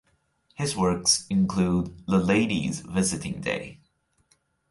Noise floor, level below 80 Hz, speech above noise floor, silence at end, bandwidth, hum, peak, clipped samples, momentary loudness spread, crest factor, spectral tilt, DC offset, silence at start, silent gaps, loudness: -68 dBFS; -50 dBFS; 43 dB; 0.95 s; 11.5 kHz; none; -8 dBFS; under 0.1%; 9 LU; 18 dB; -4.5 dB/octave; under 0.1%; 0.6 s; none; -25 LUFS